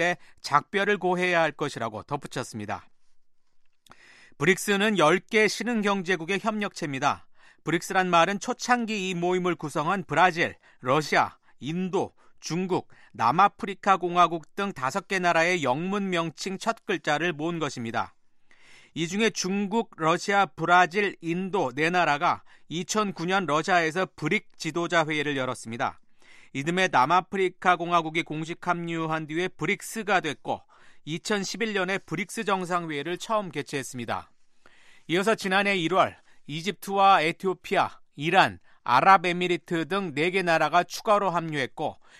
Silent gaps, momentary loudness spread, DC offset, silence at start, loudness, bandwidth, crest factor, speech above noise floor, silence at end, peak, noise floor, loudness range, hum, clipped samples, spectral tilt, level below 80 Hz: none; 11 LU; under 0.1%; 0 s; -26 LUFS; 13.5 kHz; 22 dB; 30 dB; 0.25 s; -4 dBFS; -55 dBFS; 6 LU; none; under 0.1%; -4.5 dB/octave; -66 dBFS